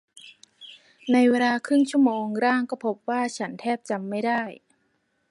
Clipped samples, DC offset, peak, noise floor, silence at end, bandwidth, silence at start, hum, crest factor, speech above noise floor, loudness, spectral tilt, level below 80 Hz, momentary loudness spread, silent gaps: under 0.1%; under 0.1%; -8 dBFS; -71 dBFS; 0.75 s; 11.5 kHz; 0.15 s; none; 16 dB; 48 dB; -24 LUFS; -5 dB/octave; -78 dBFS; 17 LU; none